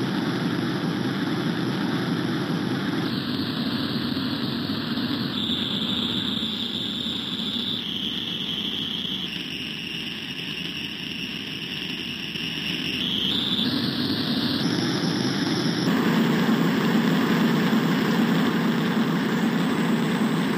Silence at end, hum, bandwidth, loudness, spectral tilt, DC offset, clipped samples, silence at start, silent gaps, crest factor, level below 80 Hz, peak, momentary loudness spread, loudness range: 0 s; none; 16 kHz; -24 LUFS; -5.5 dB/octave; under 0.1%; under 0.1%; 0 s; none; 18 dB; -58 dBFS; -6 dBFS; 8 LU; 6 LU